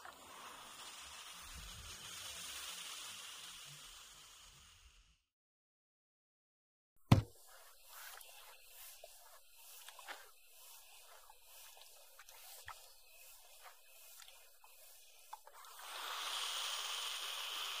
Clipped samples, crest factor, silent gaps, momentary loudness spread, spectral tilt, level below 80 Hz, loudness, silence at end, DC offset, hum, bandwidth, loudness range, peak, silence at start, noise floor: under 0.1%; 38 dB; 5.32-6.96 s; 20 LU; -3.5 dB/octave; -64 dBFS; -44 LUFS; 0 s; under 0.1%; none; 15.5 kHz; 15 LU; -10 dBFS; 0 s; -68 dBFS